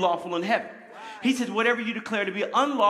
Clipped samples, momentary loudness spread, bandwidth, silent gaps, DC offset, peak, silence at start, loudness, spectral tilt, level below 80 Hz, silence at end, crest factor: under 0.1%; 12 LU; 14 kHz; none; under 0.1%; -8 dBFS; 0 s; -26 LUFS; -4 dB/octave; -80 dBFS; 0 s; 18 dB